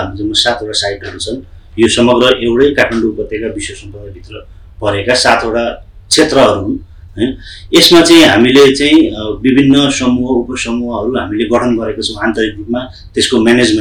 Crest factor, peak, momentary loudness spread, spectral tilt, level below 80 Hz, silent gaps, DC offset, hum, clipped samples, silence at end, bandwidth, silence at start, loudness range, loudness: 12 dB; 0 dBFS; 15 LU; -4 dB/octave; -34 dBFS; none; under 0.1%; none; under 0.1%; 0 s; 19 kHz; 0 s; 7 LU; -10 LUFS